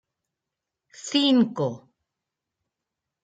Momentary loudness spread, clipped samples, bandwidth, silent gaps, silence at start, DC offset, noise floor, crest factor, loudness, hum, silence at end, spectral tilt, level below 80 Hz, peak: 20 LU; under 0.1%; 9.2 kHz; none; 1 s; under 0.1%; -86 dBFS; 18 dB; -23 LUFS; none; 1.45 s; -5 dB/octave; -76 dBFS; -10 dBFS